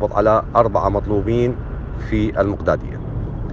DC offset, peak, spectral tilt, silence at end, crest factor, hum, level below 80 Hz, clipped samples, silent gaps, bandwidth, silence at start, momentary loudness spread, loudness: under 0.1%; 0 dBFS; -9 dB/octave; 0 s; 18 dB; none; -30 dBFS; under 0.1%; none; 7.2 kHz; 0 s; 12 LU; -19 LUFS